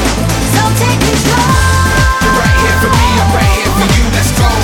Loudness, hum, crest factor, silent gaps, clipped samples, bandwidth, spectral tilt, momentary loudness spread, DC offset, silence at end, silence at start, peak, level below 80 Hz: -10 LUFS; none; 10 dB; none; under 0.1%; 18.5 kHz; -4.5 dB/octave; 2 LU; under 0.1%; 0 s; 0 s; 0 dBFS; -16 dBFS